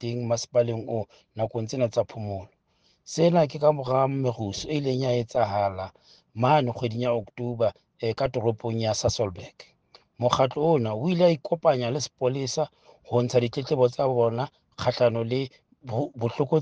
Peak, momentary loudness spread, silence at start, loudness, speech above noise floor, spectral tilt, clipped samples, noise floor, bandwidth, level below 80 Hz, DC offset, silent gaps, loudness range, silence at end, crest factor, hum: -4 dBFS; 11 LU; 0 s; -26 LUFS; 42 dB; -6 dB/octave; under 0.1%; -67 dBFS; 9.4 kHz; -58 dBFS; under 0.1%; none; 3 LU; 0 s; 20 dB; none